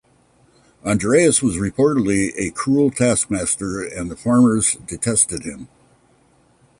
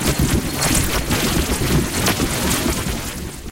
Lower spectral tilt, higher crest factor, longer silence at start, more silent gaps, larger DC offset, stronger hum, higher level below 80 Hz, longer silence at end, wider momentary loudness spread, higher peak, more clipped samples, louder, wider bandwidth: about the same, -4.5 dB/octave vs -3.5 dB/octave; about the same, 16 dB vs 16 dB; first, 0.85 s vs 0 s; neither; neither; neither; second, -46 dBFS vs -28 dBFS; first, 1.15 s vs 0 s; first, 12 LU vs 7 LU; about the same, -2 dBFS vs -4 dBFS; neither; about the same, -18 LUFS vs -19 LUFS; second, 11.5 kHz vs 17 kHz